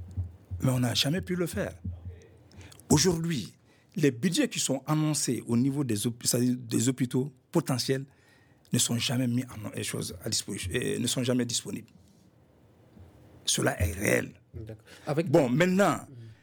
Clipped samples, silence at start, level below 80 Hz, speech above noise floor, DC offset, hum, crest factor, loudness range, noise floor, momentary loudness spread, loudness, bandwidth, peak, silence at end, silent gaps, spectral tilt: under 0.1%; 0 s; -54 dBFS; 32 dB; under 0.1%; none; 22 dB; 4 LU; -60 dBFS; 16 LU; -28 LUFS; over 20 kHz; -8 dBFS; 0.1 s; none; -4.5 dB/octave